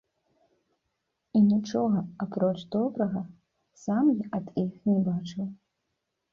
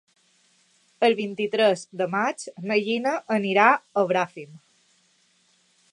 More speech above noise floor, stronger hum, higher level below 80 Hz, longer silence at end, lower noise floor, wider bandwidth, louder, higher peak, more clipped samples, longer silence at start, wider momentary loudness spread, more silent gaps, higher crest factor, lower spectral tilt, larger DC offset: first, 54 dB vs 41 dB; neither; first, -68 dBFS vs -80 dBFS; second, 0.8 s vs 1.35 s; first, -81 dBFS vs -64 dBFS; second, 7.2 kHz vs 11 kHz; second, -28 LUFS vs -23 LUFS; second, -14 dBFS vs -2 dBFS; neither; first, 1.35 s vs 1 s; first, 12 LU vs 9 LU; neither; second, 16 dB vs 22 dB; first, -8.5 dB/octave vs -4.5 dB/octave; neither